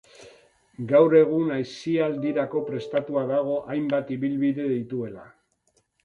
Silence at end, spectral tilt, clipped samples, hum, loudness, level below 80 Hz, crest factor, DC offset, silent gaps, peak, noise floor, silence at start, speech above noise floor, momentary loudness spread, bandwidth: 0.75 s; -8 dB/octave; under 0.1%; none; -24 LUFS; -66 dBFS; 18 dB; under 0.1%; none; -6 dBFS; -69 dBFS; 0.2 s; 45 dB; 12 LU; 7.6 kHz